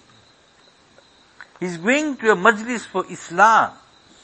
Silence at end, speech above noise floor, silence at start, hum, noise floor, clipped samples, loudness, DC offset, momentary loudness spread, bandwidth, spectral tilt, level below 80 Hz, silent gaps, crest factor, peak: 0.5 s; 35 dB; 1.4 s; none; -54 dBFS; under 0.1%; -18 LUFS; under 0.1%; 13 LU; 8.8 kHz; -4 dB/octave; -66 dBFS; none; 22 dB; 0 dBFS